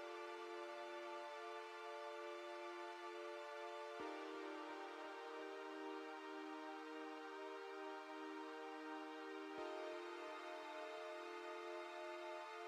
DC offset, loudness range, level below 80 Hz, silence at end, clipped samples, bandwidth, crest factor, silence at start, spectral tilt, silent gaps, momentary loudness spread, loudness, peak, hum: under 0.1%; 1 LU; under -90 dBFS; 0 s; under 0.1%; 14 kHz; 16 dB; 0 s; -2 dB/octave; none; 2 LU; -52 LUFS; -36 dBFS; none